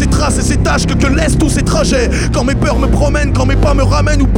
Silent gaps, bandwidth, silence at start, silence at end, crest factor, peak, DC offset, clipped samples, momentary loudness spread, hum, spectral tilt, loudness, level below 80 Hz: none; 16 kHz; 0 s; 0 s; 10 dB; 0 dBFS; 0.5%; under 0.1%; 1 LU; none; -5.5 dB/octave; -12 LUFS; -14 dBFS